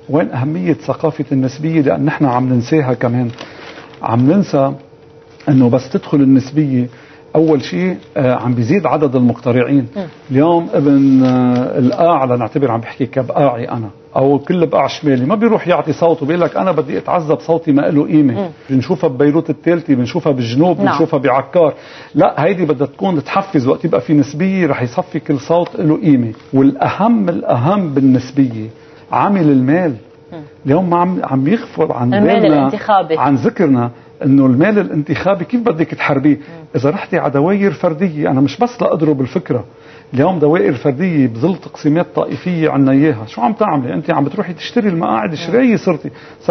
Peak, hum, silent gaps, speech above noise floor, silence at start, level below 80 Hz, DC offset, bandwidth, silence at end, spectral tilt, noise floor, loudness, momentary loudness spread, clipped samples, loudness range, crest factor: 0 dBFS; none; none; 28 dB; 0.1 s; -54 dBFS; under 0.1%; 6.4 kHz; 0 s; -8.5 dB/octave; -41 dBFS; -14 LUFS; 7 LU; under 0.1%; 2 LU; 14 dB